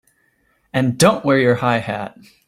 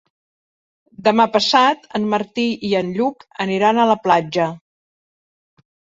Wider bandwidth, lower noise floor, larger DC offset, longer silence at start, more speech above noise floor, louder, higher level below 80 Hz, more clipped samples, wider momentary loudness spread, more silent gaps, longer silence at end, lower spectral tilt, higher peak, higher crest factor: first, 16 kHz vs 7.8 kHz; second, -62 dBFS vs under -90 dBFS; neither; second, 0.75 s vs 1 s; second, 45 dB vs over 73 dB; about the same, -17 LUFS vs -18 LUFS; first, -54 dBFS vs -62 dBFS; neither; first, 12 LU vs 9 LU; neither; second, 0.4 s vs 1.4 s; about the same, -5 dB/octave vs -5 dB/octave; about the same, -2 dBFS vs -2 dBFS; about the same, 16 dB vs 18 dB